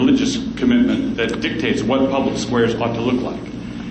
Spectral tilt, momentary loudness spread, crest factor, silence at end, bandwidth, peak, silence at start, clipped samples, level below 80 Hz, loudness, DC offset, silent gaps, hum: -5.5 dB/octave; 8 LU; 12 dB; 0 s; 9 kHz; -6 dBFS; 0 s; under 0.1%; -42 dBFS; -19 LUFS; under 0.1%; none; none